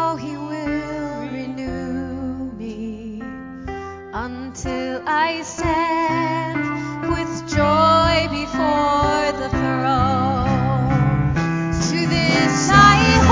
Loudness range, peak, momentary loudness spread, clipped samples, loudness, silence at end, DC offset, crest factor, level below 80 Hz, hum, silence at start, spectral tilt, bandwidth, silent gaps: 11 LU; 0 dBFS; 16 LU; under 0.1%; -19 LUFS; 0 s; under 0.1%; 20 dB; -34 dBFS; none; 0 s; -5 dB/octave; 7.6 kHz; none